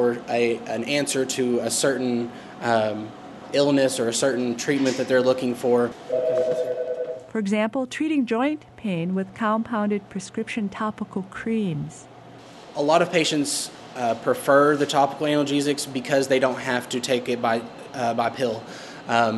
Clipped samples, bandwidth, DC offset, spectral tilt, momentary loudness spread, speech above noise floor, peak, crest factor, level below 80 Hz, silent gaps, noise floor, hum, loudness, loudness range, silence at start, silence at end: under 0.1%; 12 kHz; under 0.1%; -4 dB/octave; 11 LU; 21 dB; -4 dBFS; 20 dB; -64 dBFS; none; -44 dBFS; none; -23 LUFS; 5 LU; 0 s; 0 s